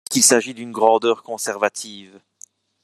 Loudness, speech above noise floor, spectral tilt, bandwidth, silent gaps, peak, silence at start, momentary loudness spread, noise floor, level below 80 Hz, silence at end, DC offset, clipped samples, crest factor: -18 LUFS; 30 dB; -1.5 dB/octave; 14 kHz; none; 0 dBFS; 0.1 s; 16 LU; -49 dBFS; -72 dBFS; 0.8 s; under 0.1%; under 0.1%; 20 dB